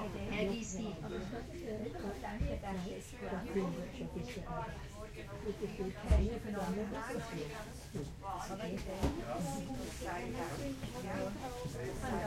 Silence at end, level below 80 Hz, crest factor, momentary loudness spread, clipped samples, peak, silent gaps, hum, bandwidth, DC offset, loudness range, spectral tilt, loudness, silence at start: 0 s; -46 dBFS; 22 dB; 7 LU; under 0.1%; -18 dBFS; none; none; 16.5 kHz; under 0.1%; 2 LU; -6 dB/octave; -41 LUFS; 0 s